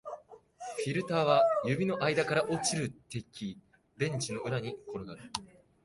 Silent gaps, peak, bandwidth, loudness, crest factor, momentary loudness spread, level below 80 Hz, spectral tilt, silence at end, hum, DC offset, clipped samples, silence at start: none; -12 dBFS; 11.5 kHz; -32 LUFS; 22 dB; 16 LU; -66 dBFS; -4.5 dB/octave; 0.4 s; none; under 0.1%; under 0.1%; 0.05 s